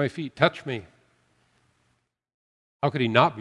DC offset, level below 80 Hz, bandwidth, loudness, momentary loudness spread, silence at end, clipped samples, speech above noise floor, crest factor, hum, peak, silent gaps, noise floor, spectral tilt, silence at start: under 0.1%; -68 dBFS; 11 kHz; -25 LUFS; 14 LU; 0 s; under 0.1%; 48 dB; 26 dB; none; -2 dBFS; 2.34-2.79 s; -72 dBFS; -7 dB/octave; 0 s